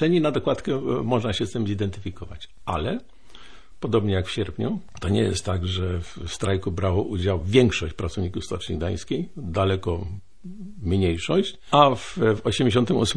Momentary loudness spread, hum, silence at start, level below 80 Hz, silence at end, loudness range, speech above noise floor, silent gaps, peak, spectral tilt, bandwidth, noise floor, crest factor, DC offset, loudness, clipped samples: 14 LU; none; 0 s; -42 dBFS; 0 s; 5 LU; 24 dB; none; -2 dBFS; -6 dB/octave; 10.5 kHz; -48 dBFS; 22 dB; 1%; -24 LUFS; under 0.1%